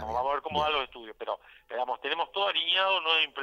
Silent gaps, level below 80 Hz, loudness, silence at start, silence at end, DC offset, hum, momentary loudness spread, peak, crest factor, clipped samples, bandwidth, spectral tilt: none; -58 dBFS; -28 LUFS; 0 s; 0 s; under 0.1%; none; 15 LU; -14 dBFS; 16 dB; under 0.1%; 15 kHz; -3.5 dB/octave